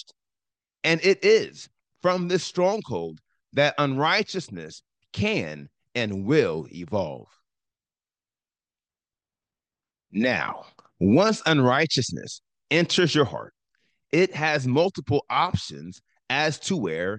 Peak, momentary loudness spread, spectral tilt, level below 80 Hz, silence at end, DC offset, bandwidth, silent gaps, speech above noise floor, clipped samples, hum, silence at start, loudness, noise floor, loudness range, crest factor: -6 dBFS; 17 LU; -5 dB/octave; -64 dBFS; 0 s; under 0.1%; 9.8 kHz; none; over 66 dB; under 0.1%; none; 0.85 s; -24 LUFS; under -90 dBFS; 10 LU; 18 dB